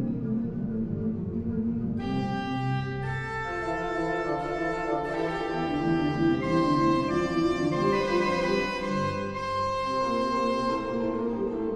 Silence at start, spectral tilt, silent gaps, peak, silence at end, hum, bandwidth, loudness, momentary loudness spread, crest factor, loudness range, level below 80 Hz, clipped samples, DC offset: 0 s; -7 dB/octave; none; -12 dBFS; 0 s; none; 10.5 kHz; -28 LUFS; 6 LU; 14 dB; 5 LU; -48 dBFS; under 0.1%; under 0.1%